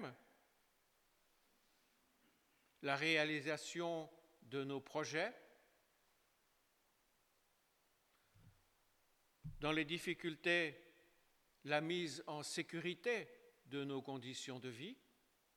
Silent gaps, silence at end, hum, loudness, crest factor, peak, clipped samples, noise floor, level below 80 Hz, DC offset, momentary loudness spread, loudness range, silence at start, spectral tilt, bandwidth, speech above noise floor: none; 0.65 s; none; -42 LUFS; 26 dB; -22 dBFS; under 0.1%; -79 dBFS; -74 dBFS; under 0.1%; 17 LU; 7 LU; 0 s; -4 dB/octave; 19 kHz; 36 dB